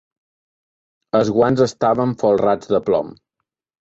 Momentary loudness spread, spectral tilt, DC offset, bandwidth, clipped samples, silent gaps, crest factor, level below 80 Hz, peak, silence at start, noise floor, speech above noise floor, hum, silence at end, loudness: 5 LU; -7 dB/octave; under 0.1%; 8 kHz; under 0.1%; none; 16 dB; -54 dBFS; -2 dBFS; 1.15 s; -79 dBFS; 62 dB; none; 0.7 s; -18 LUFS